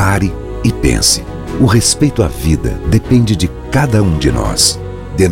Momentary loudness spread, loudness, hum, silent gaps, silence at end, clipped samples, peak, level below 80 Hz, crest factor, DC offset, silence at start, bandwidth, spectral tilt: 7 LU; -13 LUFS; none; none; 0 s; under 0.1%; 0 dBFS; -24 dBFS; 12 dB; under 0.1%; 0 s; 17 kHz; -4.5 dB/octave